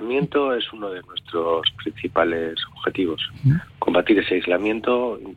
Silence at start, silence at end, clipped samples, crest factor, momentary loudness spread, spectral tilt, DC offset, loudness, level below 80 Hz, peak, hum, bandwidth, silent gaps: 0 s; 0 s; under 0.1%; 16 dB; 9 LU; -8 dB/octave; under 0.1%; -22 LUFS; -52 dBFS; -6 dBFS; none; 6.6 kHz; none